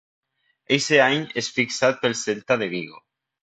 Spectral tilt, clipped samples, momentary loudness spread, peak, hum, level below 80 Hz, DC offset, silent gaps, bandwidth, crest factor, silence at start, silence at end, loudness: -3.5 dB/octave; under 0.1%; 10 LU; -4 dBFS; none; -66 dBFS; under 0.1%; none; 9.2 kHz; 20 dB; 0.7 s; 0.45 s; -21 LUFS